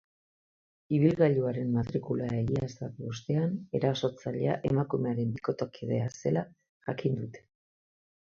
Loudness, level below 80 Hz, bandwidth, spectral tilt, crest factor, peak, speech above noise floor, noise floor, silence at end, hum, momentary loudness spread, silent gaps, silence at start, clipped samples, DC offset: -31 LUFS; -60 dBFS; 7.2 kHz; -8 dB/octave; 20 dB; -10 dBFS; over 60 dB; under -90 dBFS; 0.9 s; none; 12 LU; 6.69-6.80 s; 0.9 s; under 0.1%; under 0.1%